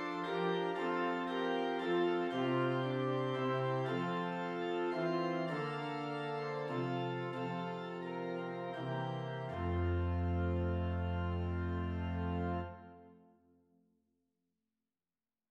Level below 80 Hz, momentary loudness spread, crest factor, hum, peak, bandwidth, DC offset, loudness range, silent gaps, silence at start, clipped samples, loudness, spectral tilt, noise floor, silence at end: -54 dBFS; 6 LU; 14 dB; none; -24 dBFS; 7.6 kHz; under 0.1%; 6 LU; none; 0 s; under 0.1%; -37 LUFS; -8 dB/octave; under -90 dBFS; 2.35 s